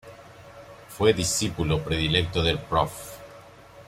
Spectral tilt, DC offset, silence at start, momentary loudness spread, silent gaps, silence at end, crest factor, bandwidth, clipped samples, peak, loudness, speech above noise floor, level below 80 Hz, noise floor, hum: -4 dB/octave; under 0.1%; 0.05 s; 23 LU; none; 0.05 s; 20 dB; 16 kHz; under 0.1%; -6 dBFS; -24 LUFS; 23 dB; -44 dBFS; -48 dBFS; none